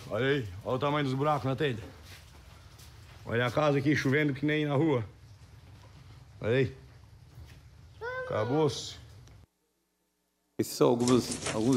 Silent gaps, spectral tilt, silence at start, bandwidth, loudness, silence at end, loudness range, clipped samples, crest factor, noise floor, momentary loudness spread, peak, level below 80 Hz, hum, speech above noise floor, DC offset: none; -5.5 dB/octave; 0 s; 16 kHz; -29 LUFS; 0 s; 6 LU; under 0.1%; 20 dB; -77 dBFS; 19 LU; -10 dBFS; -58 dBFS; none; 49 dB; under 0.1%